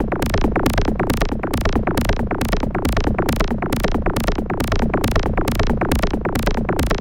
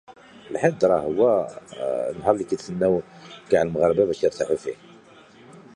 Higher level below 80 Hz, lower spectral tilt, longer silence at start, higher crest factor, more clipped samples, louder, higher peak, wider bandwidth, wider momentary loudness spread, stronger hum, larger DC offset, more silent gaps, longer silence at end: first, -22 dBFS vs -56 dBFS; about the same, -6 dB/octave vs -6.5 dB/octave; about the same, 0 s vs 0.1 s; about the same, 18 dB vs 20 dB; neither; first, -20 LUFS vs -23 LUFS; first, 0 dBFS vs -4 dBFS; first, 17 kHz vs 10.5 kHz; second, 2 LU vs 14 LU; neither; neither; neither; second, 0 s vs 0.15 s